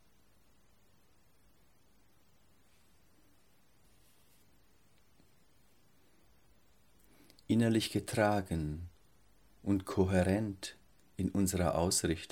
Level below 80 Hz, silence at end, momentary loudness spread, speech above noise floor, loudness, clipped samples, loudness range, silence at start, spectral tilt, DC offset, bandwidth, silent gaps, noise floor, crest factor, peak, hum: -58 dBFS; 0.05 s; 15 LU; 38 dB; -33 LUFS; under 0.1%; 4 LU; 7.5 s; -5 dB/octave; under 0.1%; 17 kHz; none; -70 dBFS; 22 dB; -14 dBFS; none